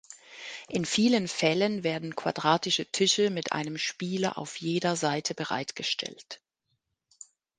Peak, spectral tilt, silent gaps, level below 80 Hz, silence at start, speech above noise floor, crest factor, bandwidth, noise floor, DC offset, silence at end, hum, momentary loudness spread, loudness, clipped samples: -8 dBFS; -3.5 dB/octave; none; -72 dBFS; 0.1 s; 51 dB; 22 dB; 10 kHz; -79 dBFS; under 0.1%; 1.2 s; none; 16 LU; -28 LUFS; under 0.1%